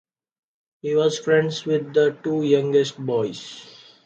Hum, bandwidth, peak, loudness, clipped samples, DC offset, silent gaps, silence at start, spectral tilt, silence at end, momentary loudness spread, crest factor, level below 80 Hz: none; 8.2 kHz; -6 dBFS; -21 LUFS; under 0.1%; under 0.1%; none; 0.85 s; -5.5 dB/octave; 0.35 s; 14 LU; 16 dB; -70 dBFS